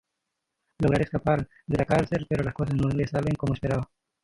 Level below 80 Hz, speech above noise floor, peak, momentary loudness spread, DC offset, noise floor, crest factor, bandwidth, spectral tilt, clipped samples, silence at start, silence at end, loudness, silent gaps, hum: -46 dBFS; 57 dB; -8 dBFS; 5 LU; under 0.1%; -82 dBFS; 20 dB; 11.5 kHz; -8 dB/octave; under 0.1%; 0.8 s; 0.4 s; -27 LUFS; none; none